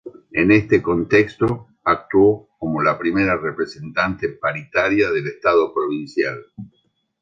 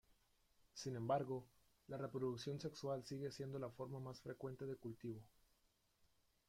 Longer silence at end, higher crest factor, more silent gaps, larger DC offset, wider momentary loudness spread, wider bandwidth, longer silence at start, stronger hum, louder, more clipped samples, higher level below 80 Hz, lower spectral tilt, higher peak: second, 0.55 s vs 1.2 s; about the same, 18 dB vs 20 dB; neither; neither; about the same, 10 LU vs 10 LU; second, 7.6 kHz vs 16 kHz; about the same, 0.05 s vs 0.1 s; neither; first, -19 LUFS vs -48 LUFS; neither; first, -48 dBFS vs -78 dBFS; about the same, -7.5 dB/octave vs -6.5 dB/octave; first, -2 dBFS vs -28 dBFS